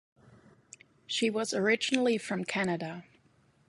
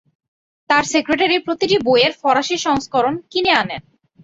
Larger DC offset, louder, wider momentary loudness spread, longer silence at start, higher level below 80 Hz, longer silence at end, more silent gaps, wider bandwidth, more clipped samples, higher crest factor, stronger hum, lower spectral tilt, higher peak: neither; second, -30 LUFS vs -17 LUFS; first, 9 LU vs 5 LU; second, 0.3 s vs 0.7 s; second, -76 dBFS vs -54 dBFS; first, 0.65 s vs 0.45 s; neither; first, 11.5 kHz vs 8 kHz; neither; first, 22 dB vs 16 dB; neither; about the same, -4 dB/octave vs -3 dB/octave; second, -10 dBFS vs -2 dBFS